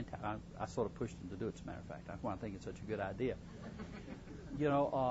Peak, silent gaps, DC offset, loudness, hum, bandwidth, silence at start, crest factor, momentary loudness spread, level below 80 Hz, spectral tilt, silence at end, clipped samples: -22 dBFS; none; under 0.1%; -42 LUFS; none; 7.6 kHz; 0 s; 18 dB; 14 LU; -58 dBFS; -6.5 dB/octave; 0 s; under 0.1%